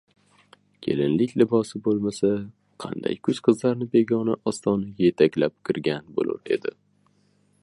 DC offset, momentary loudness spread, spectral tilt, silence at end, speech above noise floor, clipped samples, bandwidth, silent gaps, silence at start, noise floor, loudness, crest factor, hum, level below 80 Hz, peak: under 0.1%; 9 LU; -6.5 dB/octave; 0.95 s; 41 dB; under 0.1%; 11.5 kHz; none; 0.8 s; -64 dBFS; -24 LUFS; 20 dB; 50 Hz at -50 dBFS; -62 dBFS; -4 dBFS